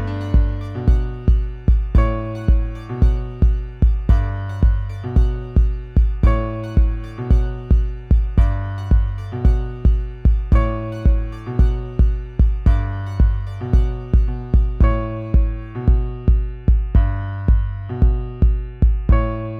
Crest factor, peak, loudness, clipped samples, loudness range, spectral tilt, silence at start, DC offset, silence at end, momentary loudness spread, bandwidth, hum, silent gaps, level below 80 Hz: 14 dB; -4 dBFS; -20 LUFS; under 0.1%; 1 LU; -9.5 dB/octave; 0 s; under 0.1%; 0 s; 5 LU; 3.7 kHz; none; none; -18 dBFS